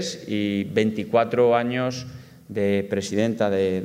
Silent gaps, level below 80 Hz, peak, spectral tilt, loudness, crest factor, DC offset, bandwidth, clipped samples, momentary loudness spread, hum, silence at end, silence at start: none; -62 dBFS; -6 dBFS; -6 dB/octave; -23 LUFS; 18 dB; under 0.1%; 15.5 kHz; under 0.1%; 9 LU; none; 0 s; 0 s